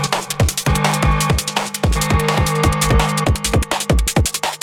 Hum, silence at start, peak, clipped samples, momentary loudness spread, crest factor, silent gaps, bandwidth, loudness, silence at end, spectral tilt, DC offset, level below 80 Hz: none; 0 s; -2 dBFS; under 0.1%; 4 LU; 16 dB; none; 19 kHz; -17 LUFS; 0.05 s; -4 dB/octave; under 0.1%; -24 dBFS